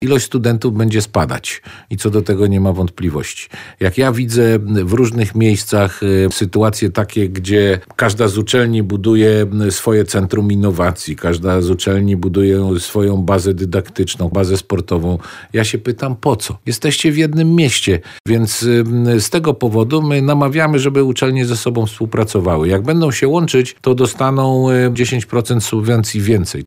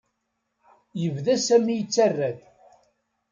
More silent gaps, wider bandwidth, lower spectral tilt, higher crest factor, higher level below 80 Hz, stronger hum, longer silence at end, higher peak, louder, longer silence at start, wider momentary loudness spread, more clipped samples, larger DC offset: first, 18.20-18.25 s vs none; first, 16 kHz vs 9.4 kHz; about the same, -5.5 dB/octave vs -5 dB/octave; second, 12 dB vs 18 dB; first, -40 dBFS vs -72 dBFS; neither; second, 0 s vs 0.95 s; first, -2 dBFS vs -8 dBFS; first, -15 LUFS vs -23 LUFS; second, 0 s vs 0.95 s; second, 6 LU vs 13 LU; neither; neither